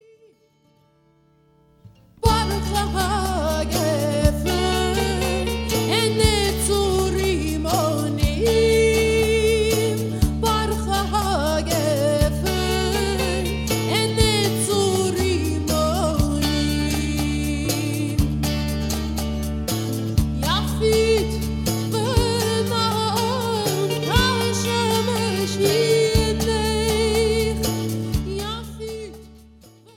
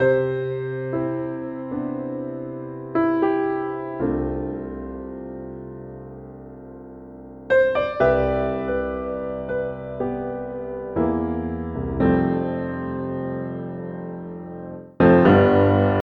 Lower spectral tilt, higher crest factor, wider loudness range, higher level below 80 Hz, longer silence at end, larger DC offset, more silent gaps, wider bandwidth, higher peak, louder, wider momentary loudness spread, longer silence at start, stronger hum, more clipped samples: second, -4.5 dB/octave vs -10 dB/octave; about the same, 18 dB vs 20 dB; about the same, 4 LU vs 6 LU; first, -30 dBFS vs -42 dBFS; first, 0.55 s vs 0 s; neither; neither; first, 17 kHz vs 5.4 kHz; about the same, -2 dBFS vs -2 dBFS; about the same, -21 LUFS vs -23 LUFS; second, 6 LU vs 19 LU; first, 1.85 s vs 0 s; neither; neither